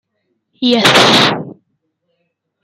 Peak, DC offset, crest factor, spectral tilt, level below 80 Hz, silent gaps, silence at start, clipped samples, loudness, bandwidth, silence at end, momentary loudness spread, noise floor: 0 dBFS; under 0.1%; 14 dB; -3.5 dB/octave; -56 dBFS; none; 0.6 s; under 0.1%; -9 LUFS; 16.5 kHz; 1.1 s; 16 LU; -68 dBFS